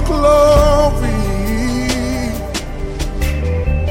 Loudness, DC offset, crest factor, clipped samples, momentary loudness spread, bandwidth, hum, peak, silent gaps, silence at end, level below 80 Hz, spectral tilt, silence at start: -16 LUFS; under 0.1%; 12 dB; under 0.1%; 13 LU; 17 kHz; none; -2 dBFS; none; 0 s; -20 dBFS; -6 dB/octave; 0 s